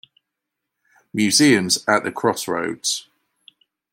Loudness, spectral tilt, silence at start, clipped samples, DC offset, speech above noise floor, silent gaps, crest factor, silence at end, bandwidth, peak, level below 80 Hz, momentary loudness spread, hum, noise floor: -19 LUFS; -3 dB/octave; 1.15 s; under 0.1%; under 0.1%; 62 dB; none; 20 dB; 0.9 s; 16.5 kHz; -2 dBFS; -66 dBFS; 10 LU; none; -81 dBFS